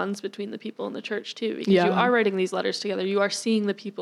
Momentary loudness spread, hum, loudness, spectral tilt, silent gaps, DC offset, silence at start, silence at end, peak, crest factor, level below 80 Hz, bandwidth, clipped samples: 13 LU; none; -25 LUFS; -5 dB/octave; none; under 0.1%; 0 s; 0 s; -8 dBFS; 18 dB; -78 dBFS; 12.5 kHz; under 0.1%